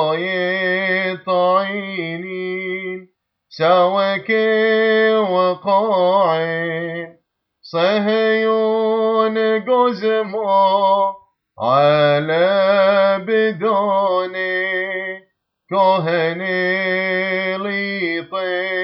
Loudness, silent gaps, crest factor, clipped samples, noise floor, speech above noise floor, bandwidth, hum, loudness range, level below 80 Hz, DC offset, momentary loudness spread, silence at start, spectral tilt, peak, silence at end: -17 LUFS; none; 16 dB; under 0.1%; -61 dBFS; 45 dB; 6 kHz; none; 3 LU; -70 dBFS; under 0.1%; 10 LU; 0 s; -7.5 dB/octave; -2 dBFS; 0 s